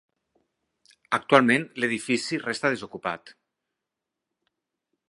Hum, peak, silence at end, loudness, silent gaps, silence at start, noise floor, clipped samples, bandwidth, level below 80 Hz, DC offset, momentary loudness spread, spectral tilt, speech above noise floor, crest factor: none; 0 dBFS; 1.8 s; -24 LUFS; none; 1.1 s; -86 dBFS; under 0.1%; 11.5 kHz; -72 dBFS; under 0.1%; 14 LU; -4.5 dB/octave; 61 dB; 28 dB